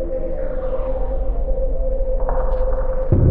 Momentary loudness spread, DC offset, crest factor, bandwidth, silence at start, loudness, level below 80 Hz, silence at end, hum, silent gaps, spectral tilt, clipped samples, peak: 5 LU; under 0.1%; 14 dB; 2.3 kHz; 0 s; -24 LUFS; -20 dBFS; 0 s; none; none; -12.5 dB/octave; under 0.1%; -4 dBFS